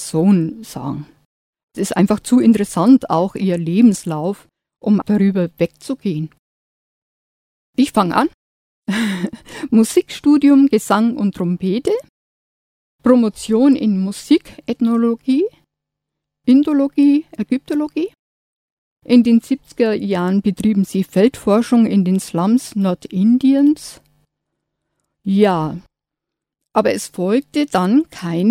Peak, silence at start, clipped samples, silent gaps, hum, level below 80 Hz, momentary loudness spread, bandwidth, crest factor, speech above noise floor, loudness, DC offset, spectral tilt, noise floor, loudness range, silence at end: 0 dBFS; 0 s; under 0.1%; 1.25-1.53 s, 1.63-1.68 s, 6.39-7.73 s, 8.34-8.82 s, 12.09-12.99 s, 18.19-18.96 s; none; -54 dBFS; 12 LU; 15.5 kHz; 16 dB; 67 dB; -16 LUFS; under 0.1%; -6.5 dB/octave; -82 dBFS; 5 LU; 0 s